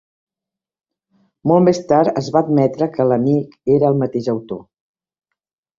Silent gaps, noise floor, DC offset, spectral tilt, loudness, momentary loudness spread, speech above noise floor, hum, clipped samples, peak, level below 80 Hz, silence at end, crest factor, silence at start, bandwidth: none; -87 dBFS; under 0.1%; -8 dB/octave; -16 LUFS; 10 LU; 71 dB; none; under 0.1%; -2 dBFS; -56 dBFS; 1.15 s; 16 dB; 1.45 s; 7.6 kHz